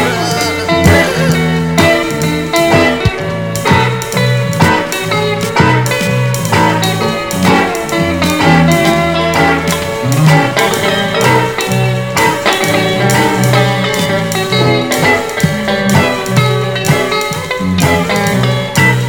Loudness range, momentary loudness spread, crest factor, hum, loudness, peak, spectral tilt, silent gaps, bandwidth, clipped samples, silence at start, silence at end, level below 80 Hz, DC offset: 1 LU; 5 LU; 12 dB; none; -11 LUFS; 0 dBFS; -5 dB/octave; none; 18 kHz; under 0.1%; 0 s; 0 s; -34 dBFS; 0.6%